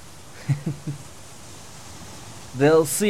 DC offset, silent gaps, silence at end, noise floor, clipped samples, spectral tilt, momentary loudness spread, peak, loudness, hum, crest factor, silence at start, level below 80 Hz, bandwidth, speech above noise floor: 0.6%; none; 0 s; -43 dBFS; under 0.1%; -5 dB/octave; 24 LU; -6 dBFS; -22 LUFS; none; 20 dB; 0 s; -54 dBFS; 16 kHz; 22 dB